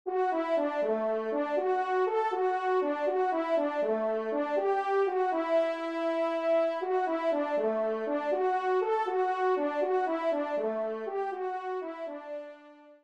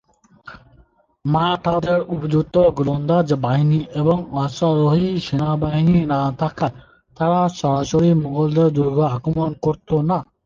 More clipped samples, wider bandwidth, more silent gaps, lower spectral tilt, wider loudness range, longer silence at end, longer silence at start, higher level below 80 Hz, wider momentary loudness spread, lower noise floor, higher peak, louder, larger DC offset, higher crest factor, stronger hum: neither; first, 8.2 kHz vs 7.2 kHz; neither; second, -5.5 dB/octave vs -8 dB/octave; about the same, 2 LU vs 1 LU; second, 0.1 s vs 0.25 s; second, 0.05 s vs 0.45 s; second, -82 dBFS vs -46 dBFS; about the same, 6 LU vs 6 LU; about the same, -53 dBFS vs -54 dBFS; second, -18 dBFS vs -4 dBFS; second, -30 LUFS vs -19 LUFS; neither; about the same, 12 dB vs 14 dB; neither